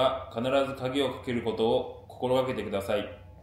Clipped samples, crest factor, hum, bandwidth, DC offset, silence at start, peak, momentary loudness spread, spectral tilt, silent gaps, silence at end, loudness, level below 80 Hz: under 0.1%; 16 dB; none; 15.5 kHz; under 0.1%; 0 s; -12 dBFS; 5 LU; -6 dB/octave; none; 0 s; -29 LUFS; -56 dBFS